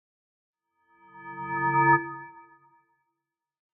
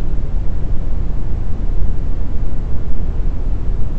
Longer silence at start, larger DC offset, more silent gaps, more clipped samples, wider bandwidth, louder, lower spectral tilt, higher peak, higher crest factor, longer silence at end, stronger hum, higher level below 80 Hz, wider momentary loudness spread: first, 1.15 s vs 0 s; neither; neither; neither; first, 3.3 kHz vs 2.3 kHz; about the same, -24 LUFS vs -24 LUFS; second, -0.5 dB/octave vs -9.5 dB/octave; second, -8 dBFS vs 0 dBFS; first, 22 dB vs 10 dB; first, 1.35 s vs 0 s; neither; second, -70 dBFS vs -16 dBFS; first, 24 LU vs 2 LU